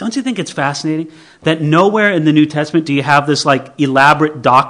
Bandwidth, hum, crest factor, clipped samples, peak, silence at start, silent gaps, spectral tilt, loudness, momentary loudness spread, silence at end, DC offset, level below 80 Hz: 12 kHz; none; 12 dB; 0.6%; 0 dBFS; 0 s; none; -5.5 dB/octave; -13 LUFS; 9 LU; 0 s; under 0.1%; -56 dBFS